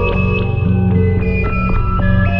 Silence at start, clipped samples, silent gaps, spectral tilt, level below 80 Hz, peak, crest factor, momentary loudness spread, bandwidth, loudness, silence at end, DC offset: 0 s; under 0.1%; none; -10 dB/octave; -20 dBFS; -2 dBFS; 12 dB; 3 LU; 5.4 kHz; -15 LUFS; 0 s; under 0.1%